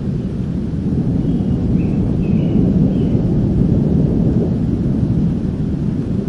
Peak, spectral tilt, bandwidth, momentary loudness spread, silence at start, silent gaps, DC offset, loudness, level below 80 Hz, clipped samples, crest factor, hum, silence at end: -2 dBFS; -10.5 dB/octave; 6.6 kHz; 5 LU; 0 s; none; 0.3%; -17 LUFS; -28 dBFS; under 0.1%; 14 dB; none; 0 s